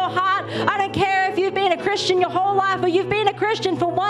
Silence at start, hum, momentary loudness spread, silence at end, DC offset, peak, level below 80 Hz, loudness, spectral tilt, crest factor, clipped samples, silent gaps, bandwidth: 0 s; none; 2 LU; 0 s; under 0.1%; -2 dBFS; -54 dBFS; -20 LUFS; -4.5 dB/octave; 18 dB; under 0.1%; none; 11.5 kHz